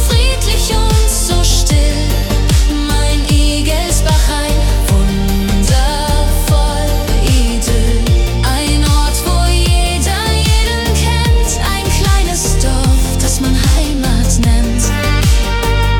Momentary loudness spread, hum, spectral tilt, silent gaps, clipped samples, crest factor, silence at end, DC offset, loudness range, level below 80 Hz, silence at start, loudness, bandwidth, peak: 2 LU; none; -4.5 dB/octave; none; under 0.1%; 10 dB; 0 s; under 0.1%; 1 LU; -12 dBFS; 0 s; -13 LUFS; 17.5 kHz; 0 dBFS